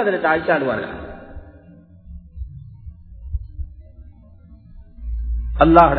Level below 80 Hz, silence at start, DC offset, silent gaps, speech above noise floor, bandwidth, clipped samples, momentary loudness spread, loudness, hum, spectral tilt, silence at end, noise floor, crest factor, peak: -30 dBFS; 0 s; under 0.1%; none; 30 dB; 5.4 kHz; under 0.1%; 24 LU; -19 LUFS; none; -9.5 dB/octave; 0 s; -45 dBFS; 22 dB; 0 dBFS